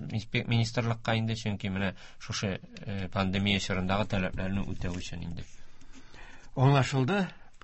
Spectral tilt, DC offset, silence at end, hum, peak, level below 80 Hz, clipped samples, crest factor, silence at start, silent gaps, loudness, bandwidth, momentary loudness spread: -6 dB/octave; under 0.1%; 0.05 s; none; -10 dBFS; -48 dBFS; under 0.1%; 20 dB; 0 s; none; -30 LUFS; 8.4 kHz; 13 LU